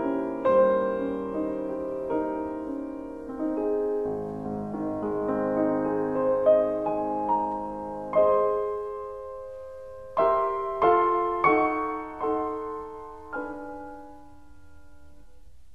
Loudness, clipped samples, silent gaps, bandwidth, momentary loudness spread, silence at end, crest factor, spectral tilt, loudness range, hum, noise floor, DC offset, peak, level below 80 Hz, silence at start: -27 LUFS; under 0.1%; none; 6 kHz; 16 LU; 0 s; 18 dB; -8.5 dB/octave; 5 LU; none; -54 dBFS; 0.2%; -8 dBFS; -56 dBFS; 0 s